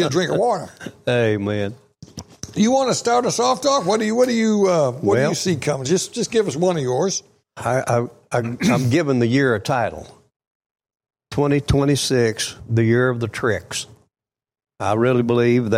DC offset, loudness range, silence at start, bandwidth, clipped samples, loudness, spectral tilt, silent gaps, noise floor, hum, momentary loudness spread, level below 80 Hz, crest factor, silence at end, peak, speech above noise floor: under 0.1%; 3 LU; 0 s; 16 kHz; under 0.1%; -19 LUFS; -5 dB/octave; 10.36-10.40 s, 10.47-10.60 s, 10.66-10.75 s; -77 dBFS; none; 10 LU; -46 dBFS; 14 dB; 0 s; -6 dBFS; 58 dB